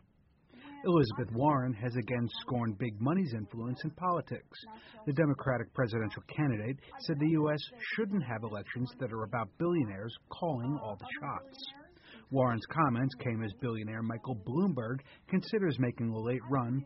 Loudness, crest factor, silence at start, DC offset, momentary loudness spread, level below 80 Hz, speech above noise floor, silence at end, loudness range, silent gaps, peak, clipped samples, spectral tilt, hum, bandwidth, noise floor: -34 LUFS; 18 dB; 0.55 s; under 0.1%; 11 LU; -64 dBFS; 34 dB; 0 s; 3 LU; none; -16 dBFS; under 0.1%; -6.5 dB/octave; none; 5.8 kHz; -67 dBFS